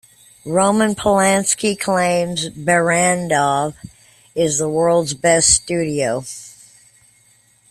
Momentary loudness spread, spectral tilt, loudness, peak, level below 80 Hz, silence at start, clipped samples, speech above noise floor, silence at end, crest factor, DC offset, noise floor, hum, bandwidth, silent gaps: 9 LU; -3.5 dB/octave; -16 LUFS; 0 dBFS; -48 dBFS; 0.45 s; under 0.1%; 38 dB; 1.2 s; 18 dB; under 0.1%; -54 dBFS; none; 14.5 kHz; none